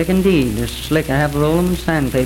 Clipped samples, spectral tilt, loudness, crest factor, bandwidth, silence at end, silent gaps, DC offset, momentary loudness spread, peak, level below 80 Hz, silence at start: under 0.1%; -6 dB/octave; -17 LUFS; 12 dB; 17 kHz; 0 s; none; under 0.1%; 5 LU; -4 dBFS; -30 dBFS; 0 s